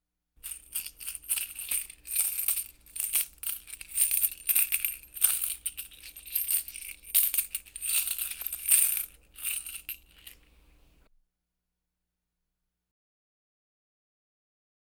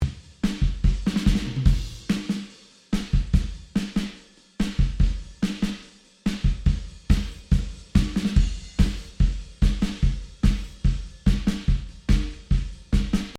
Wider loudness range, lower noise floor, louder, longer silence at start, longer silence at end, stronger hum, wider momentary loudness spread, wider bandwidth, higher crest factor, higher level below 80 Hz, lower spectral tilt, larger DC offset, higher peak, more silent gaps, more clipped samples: first, 6 LU vs 3 LU; first, -85 dBFS vs -48 dBFS; about the same, -28 LUFS vs -26 LUFS; first, 0.45 s vs 0 s; first, 4.6 s vs 0 s; first, 60 Hz at -65 dBFS vs none; first, 16 LU vs 6 LU; first, over 20 kHz vs 11.5 kHz; first, 28 dB vs 18 dB; second, -62 dBFS vs -26 dBFS; second, 3 dB/octave vs -6.5 dB/octave; neither; about the same, -4 dBFS vs -4 dBFS; neither; neither